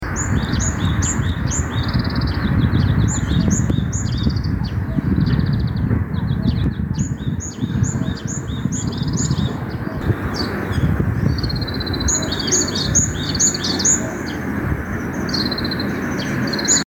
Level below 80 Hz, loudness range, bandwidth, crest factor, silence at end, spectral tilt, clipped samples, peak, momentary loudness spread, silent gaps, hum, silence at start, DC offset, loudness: -28 dBFS; 4 LU; 19.5 kHz; 16 dB; 0.1 s; -4 dB/octave; under 0.1%; -2 dBFS; 7 LU; none; none; 0 s; under 0.1%; -19 LUFS